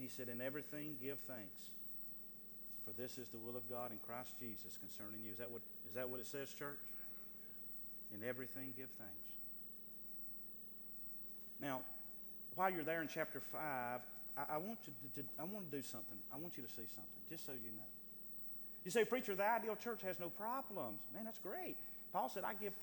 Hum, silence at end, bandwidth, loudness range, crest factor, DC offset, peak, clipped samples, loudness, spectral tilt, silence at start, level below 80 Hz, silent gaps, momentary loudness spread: none; 0 s; 19 kHz; 5 LU; 24 dB; under 0.1%; -24 dBFS; under 0.1%; -46 LUFS; -4.5 dB/octave; 0 s; -80 dBFS; none; 8 LU